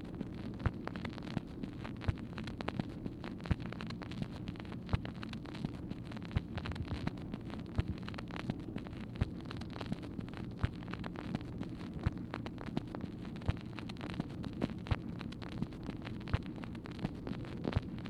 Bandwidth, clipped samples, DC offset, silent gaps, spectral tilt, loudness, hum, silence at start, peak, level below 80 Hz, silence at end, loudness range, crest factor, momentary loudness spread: 12 kHz; under 0.1%; under 0.1%; none; -7.5 dB/octave; -42 LUFS; none; 0 s; -16 dBFS; -50 dBFS; 0 s; 1 LU; 24 dB; 5 LU